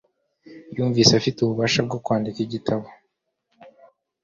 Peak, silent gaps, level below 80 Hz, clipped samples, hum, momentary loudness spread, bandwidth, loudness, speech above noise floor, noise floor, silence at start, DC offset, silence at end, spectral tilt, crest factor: 0 dBFS; none; -56 dBFS; under 0.1%; none; 11 LU; 7.6 kHz; -21 LUFS; 53 dB; -75 dBFS; 0.45 s; under 0.1%; 0.55 s; -4.5 dB/octave; 24 dB